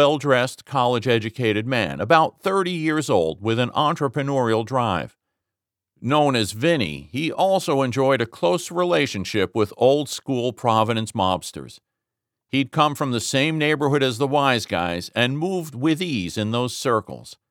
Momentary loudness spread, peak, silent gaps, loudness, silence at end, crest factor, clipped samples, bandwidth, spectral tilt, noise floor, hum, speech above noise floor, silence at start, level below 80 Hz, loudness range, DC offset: 6 LU; -4 dBFS; none; -21 LUFS; 0.15 s; 18 dB; under 0.1%; 18 kHz; -5 dB/octave; -86 dBFS; none; 65 dB; 0 s; -58 dBFS; 2 LU; under 0.1%